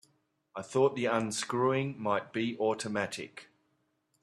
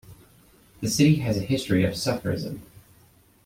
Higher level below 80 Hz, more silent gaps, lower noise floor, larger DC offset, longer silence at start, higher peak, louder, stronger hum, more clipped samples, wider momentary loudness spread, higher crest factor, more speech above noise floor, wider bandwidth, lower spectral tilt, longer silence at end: second, -74 dBFS vs -52 dBFS; neither; first, -76 dBFS vs -57 dBFS; neither; first, 0.55 s vs 0.1 s; second, -14 dBFS vs -6 dBFS; second, -31 LUFS vs -24 LUFS; neither; neither; first, 16 LU vs 13 LU; about the same, 18 dB vs 20 dB; first, 45 dB vs 34 dB; second, 13 kHz vs 16.5 kHz; about the same, -5 dB/octave vs -5.5 dB/octave; about the same, 0.8 s vs 0.8 s